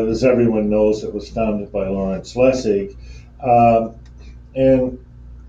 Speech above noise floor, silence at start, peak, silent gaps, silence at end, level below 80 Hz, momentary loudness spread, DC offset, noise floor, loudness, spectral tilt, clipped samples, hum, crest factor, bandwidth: 22 dB; 0 s; -2 dBFS; none; 0 s; -38 dBFS; 12 LU; under 0.1%; -38 dBFS; -17 LUFS; -7.5 dB/octave; under 0.1%; 60 Hz at -35 dBFS; 16 dB; 7.8 kHz